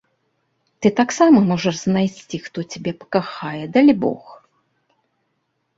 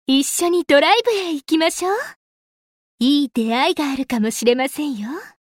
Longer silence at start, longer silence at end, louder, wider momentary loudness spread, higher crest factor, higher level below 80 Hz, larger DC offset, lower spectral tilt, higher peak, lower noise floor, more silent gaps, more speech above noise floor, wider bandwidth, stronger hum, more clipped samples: first, 0.8 s vs 0.1 s; first, 1.4 s vs 0.15 s; about the same, -18 LUFS vs -18 LUFS; first, 15 LU vs 10 LU; about the same, 18 dB vs 16 dB; about the same, -58 dBFS vs -60 dBFS; neither; first, -6 dB/octave vs -3 dB/octave; about the same, -2 dBFS vs -4 dBFS; second, -71 dBFS vs under -90 dBFS; second, none vs 2.16-2.98 s; second, 53 dB vs over 72 dB; second, 8 kHz vs 16.5 kHz; neither; neither